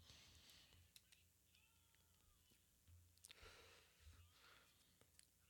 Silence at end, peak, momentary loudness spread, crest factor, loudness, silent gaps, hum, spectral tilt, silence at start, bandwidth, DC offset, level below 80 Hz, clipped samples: 0 s; -38 dBFS; 5 LU; 32 dB; -67 LUFS; none; 60 Hz at -90 dBFS; -2 dB/octave; 0 s; 19 kHz; under 0.1%; -82 dBFS; under 0.1%